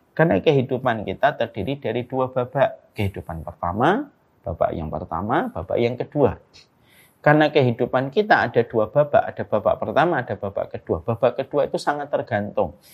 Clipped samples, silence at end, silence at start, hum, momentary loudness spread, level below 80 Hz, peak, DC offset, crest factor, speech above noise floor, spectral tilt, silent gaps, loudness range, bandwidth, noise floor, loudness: under 0.1%; 0.2 s; 0.15 s; none; 10 LU; -50 dBFS; 0 dBFS; under 0.1%; 22 dB; 34 dB; -7.5 dB/octave; none; 5 LU; 14.5 kHz; -55 dBFS; -22 LUFS